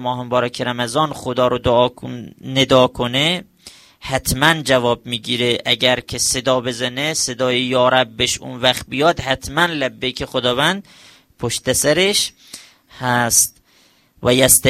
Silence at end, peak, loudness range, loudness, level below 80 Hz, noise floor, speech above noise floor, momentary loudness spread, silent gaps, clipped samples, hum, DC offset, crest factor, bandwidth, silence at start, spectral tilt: 0 s; 0 dBFS; 2 LU; -17 LUFS; -44 dBFS; -55 dBFS; 37 dB; 9 LU; none; under 0.1%; none; under 0.1%; 18 dB; 16 kHz; 0 s; -3 dB/octave